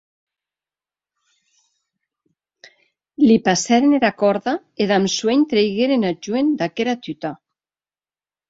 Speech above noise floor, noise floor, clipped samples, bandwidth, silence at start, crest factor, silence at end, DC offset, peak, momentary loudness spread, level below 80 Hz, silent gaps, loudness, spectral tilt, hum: over 72 dB; under -90 dBFS; under 0.1%; 8 kHz; 3.2 s; 18 dB; 1.15 s; under 0.1%; -2 dBFS; 9 LU; -62 dBFS; none; -18 LUFS; -4.5 dB/octave; none